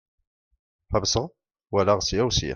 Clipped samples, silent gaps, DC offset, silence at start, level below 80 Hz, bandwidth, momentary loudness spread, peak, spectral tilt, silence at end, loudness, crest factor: under 0.1%; none; under 0.1%; 0.9 s; -42 dBFS; 11 kHz; 7 LU; -8 dBFS; -4 dB/octave; 0 s; -24 LUFS; 18 dB